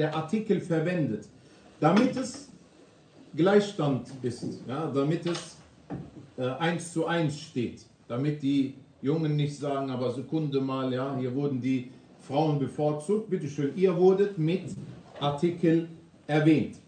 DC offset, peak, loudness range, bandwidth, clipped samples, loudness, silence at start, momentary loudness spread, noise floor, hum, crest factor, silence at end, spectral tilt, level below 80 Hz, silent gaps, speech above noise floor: under 0.1%; -10 dBFS; 4 LU; 9.4 kHz; under 0.1%; -28 LUFS; 0 s; 14 LU; -56 dBFS; none; 18 dB; 0.1 s; -7 dB/octave; -68 dBFS; none; 29 dB